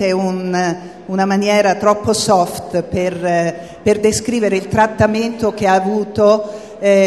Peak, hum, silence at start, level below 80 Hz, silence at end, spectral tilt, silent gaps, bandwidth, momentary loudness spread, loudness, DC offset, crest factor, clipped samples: 0 dBFS; none; 0 s; -44 dBFS; 0 s; -5 dB/octave; none; 13 kHz; 7 LU; -15 LUFS; 0.2%; 14 dB; under 0.1%